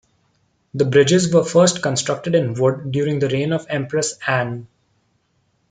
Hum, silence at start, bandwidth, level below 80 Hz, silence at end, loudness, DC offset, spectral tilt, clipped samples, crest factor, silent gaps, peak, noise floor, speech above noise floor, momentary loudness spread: none; 0.75 s; 9.6 kHz; -60 dBFS; 1.05 s; -18 LUFS; under 0.1%; -5 dB/octave; under 0.1%; 18 dB; none; -2 dBFS; -65 dBFS; 47 dB; 8 LU